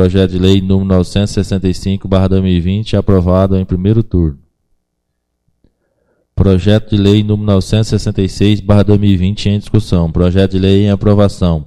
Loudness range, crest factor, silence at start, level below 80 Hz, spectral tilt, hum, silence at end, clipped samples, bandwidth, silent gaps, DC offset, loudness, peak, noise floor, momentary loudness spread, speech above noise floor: 5 LU; 12 dB; 0 s; -26 dBFS; -7.5 dB/octave; none; 0 s; under 0.1%; 10.5 kHz; none; under 0.1%; -12 LUFS; 0 dBFS; -69 dBFS; 5 LU; 58 dB